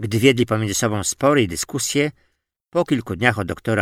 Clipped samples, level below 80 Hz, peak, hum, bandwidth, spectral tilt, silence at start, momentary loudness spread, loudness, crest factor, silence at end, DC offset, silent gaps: under 0.1%; -50 dBFS; 0 dBFS; none; 16.5 kHz; -4.5 dB/octave; 0 s; 7 LU; -20 LUFS; 20 dB; 0 s; under 0.1%; none